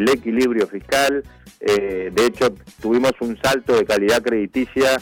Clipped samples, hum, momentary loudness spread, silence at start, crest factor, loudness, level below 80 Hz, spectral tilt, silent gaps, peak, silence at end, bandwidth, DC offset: under 0.1%; none; 5 LU; 0 s; 14 dB; -19 LUFS; -48 dBFS; -4 dB/octave; none; -4 dBFS; 0 s; 18 kHz; under 0.1%